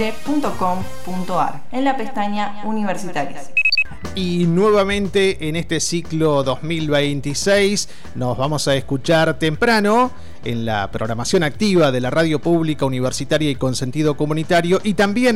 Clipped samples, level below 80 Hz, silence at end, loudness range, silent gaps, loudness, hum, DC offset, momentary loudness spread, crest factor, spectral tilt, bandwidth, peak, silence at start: under 0.1%; -42 dBFS; 0 s; 3 LU; none; -19 LUFS; none; 4%; 8 LU; 12 dB; -5 dB/octave; 16 kHz; -6 dBFS; 0 s